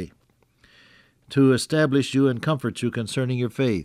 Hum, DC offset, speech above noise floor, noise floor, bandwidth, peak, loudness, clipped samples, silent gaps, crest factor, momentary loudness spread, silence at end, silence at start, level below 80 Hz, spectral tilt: none; under 0.1%; 42 dB; -63 dBFS; 14.5 kHz; -8 dBFS; -22 LUFS; under 0.1%; none; 16 dB; 8 LU; 0 s; 0 s; -60 dBFS; -6 dB/octave